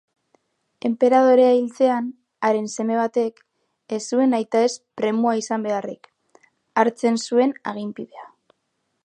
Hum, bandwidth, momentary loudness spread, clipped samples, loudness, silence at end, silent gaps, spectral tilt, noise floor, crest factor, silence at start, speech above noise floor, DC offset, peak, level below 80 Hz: none; 9.8 kHz; 15 LU; under 0.1%; -21 LUFS; 0.8 s; none; -4.5 dB/octave; -74 dBFS; 20 dB; 0.85 s; 54 dB; under 0.1%; -2 dBFS; -78 dBFS